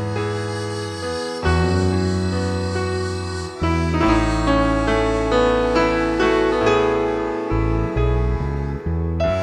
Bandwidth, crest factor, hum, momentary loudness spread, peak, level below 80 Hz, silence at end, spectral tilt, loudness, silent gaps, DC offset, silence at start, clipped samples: 11 kHz; 14 dB; none; 8 LU; -6 dBFS; -28 dBFS; 0 s; -6.5 dB/octave; -20 LUFS; none; under 0.1%; 0 s; under 0.1%